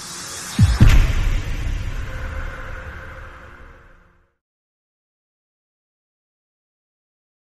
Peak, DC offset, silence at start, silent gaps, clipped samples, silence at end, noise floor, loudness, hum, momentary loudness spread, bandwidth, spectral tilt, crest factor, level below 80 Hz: -2 dBFS; under 0.1%; 0 s; none; under 0.1%; 3.9 s; -53 dBFS; -21 LUFS; none; 23 LU; 13.5 kHz; -5.5 dB/octave; 20 dB; -24 dBFS